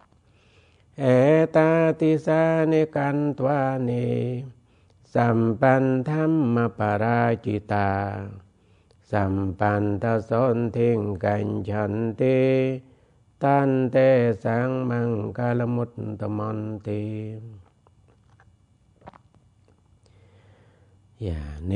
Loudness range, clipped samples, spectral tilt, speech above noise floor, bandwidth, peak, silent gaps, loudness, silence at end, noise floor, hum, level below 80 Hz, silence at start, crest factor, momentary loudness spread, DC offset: 12 LU; under 0.1%; -9 dB/octave; 37 dB; 9.6 kHz; -4 dBFS; none; -23 LUFS; 0 s; -60 dBFS; none; -52 dBFS; 1 s; 20 dB; 12 LU; under 0.1%